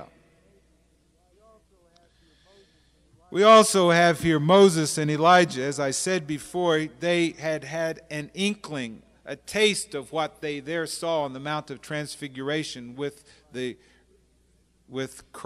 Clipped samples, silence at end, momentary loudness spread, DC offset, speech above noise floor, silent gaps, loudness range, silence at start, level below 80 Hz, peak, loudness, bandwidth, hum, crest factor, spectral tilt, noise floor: under 0.1%; 0 s; 18 LU; under 0.1%; 40 dB; none; 14 LU; 0 s; -62 dBFS; -4 dBFS; -24 LUFS; 15.5 kHz; none; 20 dB; -4 dB/octave; -64 dBFS